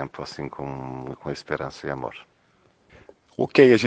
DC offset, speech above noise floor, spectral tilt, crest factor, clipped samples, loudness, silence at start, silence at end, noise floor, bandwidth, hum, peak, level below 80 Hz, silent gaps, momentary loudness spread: under 0.1%; 39 dB; -6 dB/octave; 22 dB; under 0.1%; -26 LUFS; 0 s; 0 s; -62 dBFS; 9 kHz; none; -2 dBFS; -58 dBFS; none; 17 LU